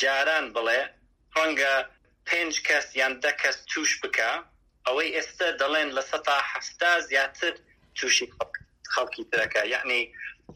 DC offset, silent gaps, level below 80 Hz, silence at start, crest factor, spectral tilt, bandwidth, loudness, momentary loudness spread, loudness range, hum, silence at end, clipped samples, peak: under 0.1%; none; -64 dBFS; 0 s; 18 dB; 0 dB/octave; 16 kHz; -25 LUFS; 11 LU; 1 LU; none; 0 s; under 0.1%; -8 dBFS